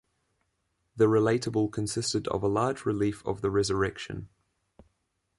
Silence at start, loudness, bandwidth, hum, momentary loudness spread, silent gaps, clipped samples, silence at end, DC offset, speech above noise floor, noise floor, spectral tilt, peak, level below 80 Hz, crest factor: 0.95 s; -28 LUFS; 11.5 kHz; none; 11 LU; none; under 0.1%; 1.1 s; under 0.1%; 50 dB; -78 dBFS; -5.5 dB/octave; -12 dBFS; -54 dBFS; 18 dB